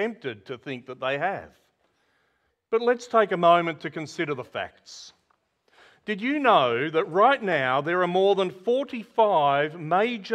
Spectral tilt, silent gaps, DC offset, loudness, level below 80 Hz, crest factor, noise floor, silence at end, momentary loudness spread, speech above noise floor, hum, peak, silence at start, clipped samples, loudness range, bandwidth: -5.5 dB/octave; none; under 0.1%; -24 LUFS; -72 dBFS; 20 dB; -72 dBFS; 0 s; 16 LU; 48 dB; none; -6 dBFS; 0 s; under 0.1%; 5 LU; 9.2 kHz